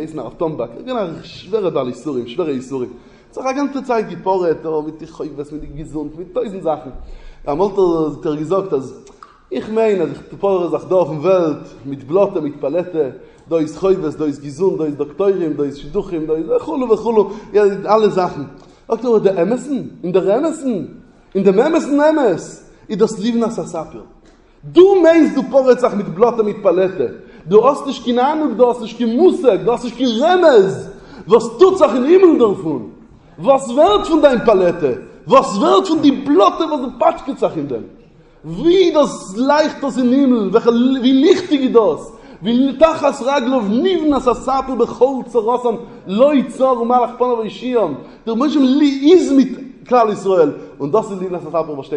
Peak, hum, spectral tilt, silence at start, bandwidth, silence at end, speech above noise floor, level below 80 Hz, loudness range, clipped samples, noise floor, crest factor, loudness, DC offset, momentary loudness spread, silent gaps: 0 dBFS; none; -6 dB/octave; 0 s; 10 kHz; 0 s; 32 dB; -46 dBFS; 7 LU; under 0.1%; -47 dBFS; 16 dB; -15 LUFS; under 0.1%; 14 LU; none